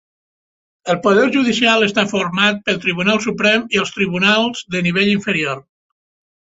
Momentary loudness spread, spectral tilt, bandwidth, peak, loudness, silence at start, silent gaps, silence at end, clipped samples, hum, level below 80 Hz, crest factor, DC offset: 6 LU; -4.5 dB/octave; 8 kHz; 0 dBFS; -15 LUFS; 0.85 s; none; 0.9 s; under 0.1%; none; -56 dBFS; 16 dB; under 0.1%